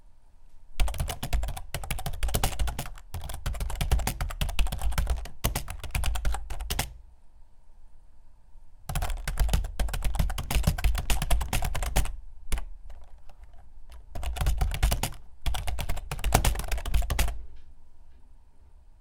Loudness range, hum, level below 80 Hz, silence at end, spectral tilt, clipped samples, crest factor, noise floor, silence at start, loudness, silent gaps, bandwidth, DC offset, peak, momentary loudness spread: 5 LU; none; -32 dBFS; 0.1 s; -4 dB/octave; under 0.1%; 26 dB; -50 dBFS; 0.05 s; -32 LUFS; none; 19 kHz; under 0.1%; -2 dBFS; 11 LU